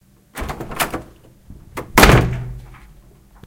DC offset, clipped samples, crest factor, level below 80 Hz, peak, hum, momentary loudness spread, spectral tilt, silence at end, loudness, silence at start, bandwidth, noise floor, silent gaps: under 0.1%; under 0.1%; 20 dB; -26 dBFS; 0 dBFS; none; 23 LU; -4.5 dB/octave; 0.7 s; -16 LUFS; 0.35 s; 17 kHz; -47 dBFS; none